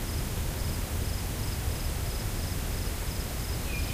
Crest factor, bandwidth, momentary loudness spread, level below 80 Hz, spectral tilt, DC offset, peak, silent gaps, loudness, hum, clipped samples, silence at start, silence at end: 12 dB; 16 kHz; 1 LU; -34 dBFS; -4.5 dB/octave; under 0.1%; -18 dBFS; none; -33 LUFS; none; under 0.1%; 0 s; 0 s